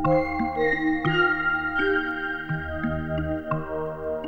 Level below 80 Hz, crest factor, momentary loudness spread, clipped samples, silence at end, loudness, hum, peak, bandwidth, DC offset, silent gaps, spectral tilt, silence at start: -42 dBFS; 16 dB; 8 LU; under 0.1%; 0 s; -25 LUFS; none; -10 dBFS; 6.6 kHz; under 0.1%; none; -8 dB/octave; 0 s